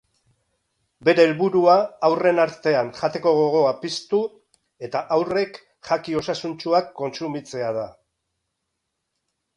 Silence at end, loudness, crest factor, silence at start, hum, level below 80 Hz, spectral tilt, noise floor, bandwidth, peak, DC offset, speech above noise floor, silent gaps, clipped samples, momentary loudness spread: 1.65 s; -21 LUFS; 20 dB; 1 s; none; -66 dBFS; -5.5 dB/octave; -78 dBFS; 10.5 kHz; -4 dBFS; under 0.1%; 58 dB; none; under 0.1%; 13 LU